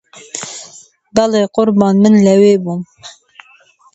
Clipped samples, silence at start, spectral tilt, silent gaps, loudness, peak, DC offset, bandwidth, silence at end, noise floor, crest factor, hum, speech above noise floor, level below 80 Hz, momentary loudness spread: under 0.1%; 0.15 s; -6 dB/octave; none; -11 LUFS; 0 dBFS; under 0.1%; 8.2 kHz; 0.85 s; -48 dBFS; 14 dB; none; 37 dB; -54 dBFS; 18 LU